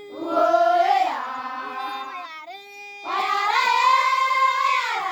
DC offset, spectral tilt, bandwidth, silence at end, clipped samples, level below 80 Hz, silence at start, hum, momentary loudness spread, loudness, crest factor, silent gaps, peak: under 0.1%; -1 dB/octave; over 20 kHz; 0 s; under 0.1%; -84 dBFS; 0 s; none; 17 LU; -21 LUFS; 14 dB; none; -8 dBFS